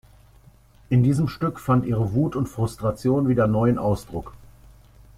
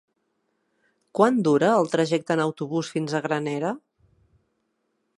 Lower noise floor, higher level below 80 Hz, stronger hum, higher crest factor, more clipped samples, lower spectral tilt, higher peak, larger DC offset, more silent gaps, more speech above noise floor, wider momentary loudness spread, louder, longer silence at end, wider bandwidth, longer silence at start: second, -52 dBFS vs -74 dBFS; first, -46 dBFS vs -72 dBFS; first, 50 Hz at -45 dBFS vs none; second, 16 dB vs 22 dB; neither; first, -8.5 dB/octave vs -6 dB/octave; second, -8 dBFS vs -4 dBFS; neither; neither; second, 31 dB vs 52 dB; about the same, 8 LU vs 9 LU; about the same, -22 LUFS vs -23 LUFS; second, 0.8 s vs 1.4 s; first, 14.5 kHz vs 11.5 kHz; second, 0.9 s vs 1.15 s